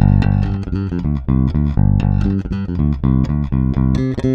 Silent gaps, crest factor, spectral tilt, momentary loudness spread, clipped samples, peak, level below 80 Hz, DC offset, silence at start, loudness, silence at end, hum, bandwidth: none; 14 dB; -10 dB/octave; 6 LU; under 0.1%; 0 dBFS; -22 dBFS; under 0.1%; 0 s; -17 LUFS; 0 s; none; 6.6 kHz